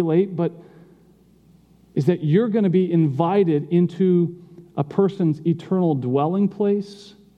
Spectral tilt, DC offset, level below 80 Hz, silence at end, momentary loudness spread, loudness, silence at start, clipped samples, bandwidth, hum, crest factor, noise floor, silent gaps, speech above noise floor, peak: -10 dB/octave; under 0.1%; -68 dBFS; 0.3 s; 8 LU; -21 LUFS; 0 s; under 0.1%; 6.8 kHz; none; 16 dB; -54 dBFS; none; 34 dB; -4 dBFS